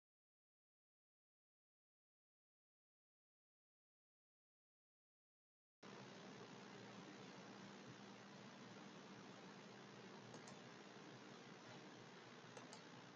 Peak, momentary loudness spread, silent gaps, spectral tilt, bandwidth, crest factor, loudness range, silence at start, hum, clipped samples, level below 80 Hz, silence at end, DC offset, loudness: -42 dBFS; 1 LU; none; -3.5 dB/octave; 7.4 kHz; 20 dB; 5 LU; 5.8 s; none; under 0.1%; under -90 dBFS; 0 s; under 0.1%; -60 LUFS